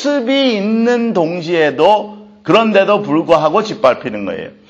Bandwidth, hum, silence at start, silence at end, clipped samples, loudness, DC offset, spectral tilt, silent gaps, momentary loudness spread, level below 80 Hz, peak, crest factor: 8 kHz; none; 0 s; 0.2 s; under 0.1%; -13 LUFS; under 0.1%; -5.5 dB/octave; none; 10 LU; -56 dBFS; 0 dBFS; 14 dB